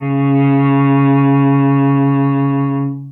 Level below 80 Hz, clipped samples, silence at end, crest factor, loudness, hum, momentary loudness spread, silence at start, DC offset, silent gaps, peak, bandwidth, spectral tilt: -70 dBFS; under 0.1%; 0 s; 10 dB; -13 LUFS; none; 4 LU; 0 s; under 0.1%; none; -4 dBFS; 3.7 kHz; -12.5 dB/octave